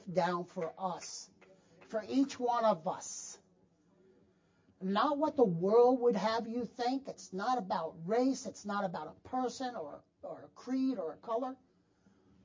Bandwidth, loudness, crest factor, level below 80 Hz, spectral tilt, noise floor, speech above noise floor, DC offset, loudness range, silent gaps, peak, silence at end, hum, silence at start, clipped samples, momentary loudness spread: 7.6 kHz; -34 LUFS; 20 dB; -78 dBFS; -5.5 dB/octave; -70 dBFS; 36 dB; under 0.1%; 7 LU; none; -16 dBFS; 0.9 s; none; 0.05 s; under 0.1%; 17 LU